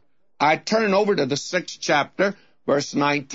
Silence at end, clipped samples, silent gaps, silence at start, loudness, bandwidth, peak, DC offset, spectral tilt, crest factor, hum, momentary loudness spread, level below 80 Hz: 0 s; under 0.1%; none; 0.4 s; -22 LUFS; 8 kHz; -6 dBFS; 0.1%; -4 dB/octave; 16 dB; none; 5 LU; -70 dBFS